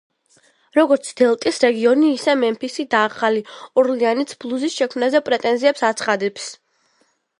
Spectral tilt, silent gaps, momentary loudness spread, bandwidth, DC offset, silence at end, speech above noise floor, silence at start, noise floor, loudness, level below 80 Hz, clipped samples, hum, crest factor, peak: -3.5 dB/octave; none; 8 LU; 11.5 kHz; under 0.1%; 0.85 s; 46 dB; 0.75 s; -64 dBFS; -18 LUFS; -70 dBFS; under 0.1%; none; 18 dB; -2 dBFS